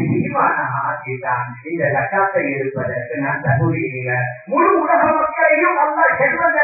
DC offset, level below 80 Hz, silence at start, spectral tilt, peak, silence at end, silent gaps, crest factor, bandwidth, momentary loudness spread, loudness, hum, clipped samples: under 0.1%; -52 dBFS; 0 s; -15.5 dB/octave; -2 dBFS; 0 s; none; 16 dB; 2.7 kHz; 8 LU; -17 LUFS; none; under 0.1%